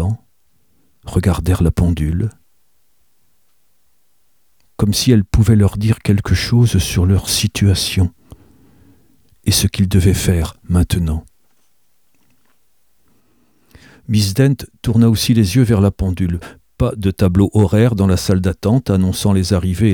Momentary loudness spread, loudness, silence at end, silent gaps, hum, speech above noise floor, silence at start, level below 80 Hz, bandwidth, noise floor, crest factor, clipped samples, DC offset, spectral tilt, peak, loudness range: 8 LU; -15 LUFS; 0 s; none; none; 50 dB; 0 s; -30 dBFS; 19 kHz; -64 dBFS; 14 dB; under 0.1%; 0.2%; -6 dB/octave; 0 dBFS; 8 LU